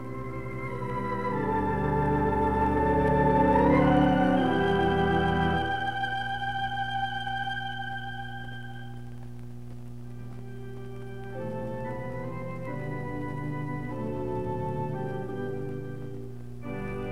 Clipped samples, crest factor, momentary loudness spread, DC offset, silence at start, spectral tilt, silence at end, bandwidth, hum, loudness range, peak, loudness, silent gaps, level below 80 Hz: under 0.1%; 18 dB; 19 LU; 0.8%; 0 s; -8 dB/octave; 0 s; 12.5 kHz; 60 Hz at -40 dBFS; 15 LU; -10 dBFS; -28 LUFS; none; -44 dBFS